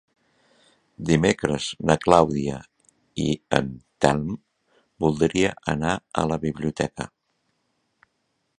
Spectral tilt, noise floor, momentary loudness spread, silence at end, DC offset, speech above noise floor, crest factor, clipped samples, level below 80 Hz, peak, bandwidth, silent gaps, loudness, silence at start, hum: -5.5 dB/octave; -73 dBFS; 16 LU; 1.55 s; under 0.1%; 51 dB; 24 dB; under 0.1%; -48 dBFS; 0 dBFS; 11 kHz; none; -23 LUFS; 1 s; none